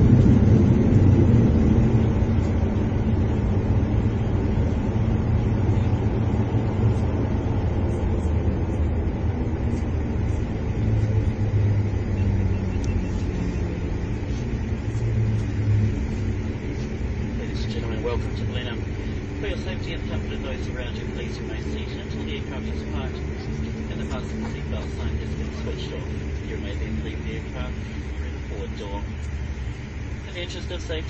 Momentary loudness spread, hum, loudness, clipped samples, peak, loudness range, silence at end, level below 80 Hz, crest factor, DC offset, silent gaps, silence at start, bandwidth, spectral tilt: 12 LU; none; -25 LUFS; under 0.1%; -4 dBFS; 9 LU; 0 s; -30 dBFS; 18 dB; under 0.1%; none; 0 s; 7.8 kHz; -8 dB/octave